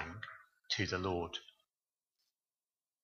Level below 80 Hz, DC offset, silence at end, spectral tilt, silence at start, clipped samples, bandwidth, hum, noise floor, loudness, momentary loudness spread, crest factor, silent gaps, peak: -66 dBFS; under 0.1%; 1.6 s; -4 dB/octave; 0 s; under 0.1%; 7.2 kHz; none; under -90 dBFS; -39 LUFS; 15 LU; 22 dB; none; -22 dBFS